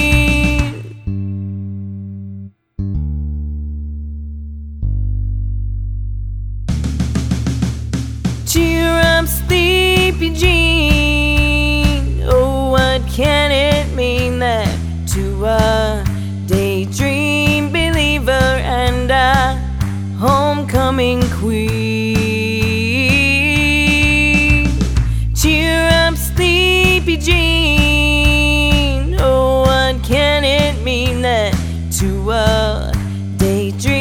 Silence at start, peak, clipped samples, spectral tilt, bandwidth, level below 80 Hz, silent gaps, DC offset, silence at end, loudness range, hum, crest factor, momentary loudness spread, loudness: 0 s; 0 dBFS; under 0.1%; -5 dB/octave; 19 kHz; -20 dBFS; none; under 0.1%; 0 s; 11 LU; 50 Hz at -40 dBFS; 14 dB; 12 LU; -14 LUFS